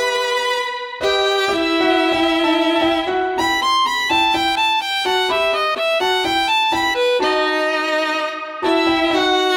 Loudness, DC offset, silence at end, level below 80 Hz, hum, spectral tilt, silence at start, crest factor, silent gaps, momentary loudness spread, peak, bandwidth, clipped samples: -17 LUFS; under 0.1%; 0 s; -50 dBFS; none; -2.5 dB/octave; 0 s; 14 dB; none; 4 LU; -4 dBFS; 17.5 kHz; under 0.1%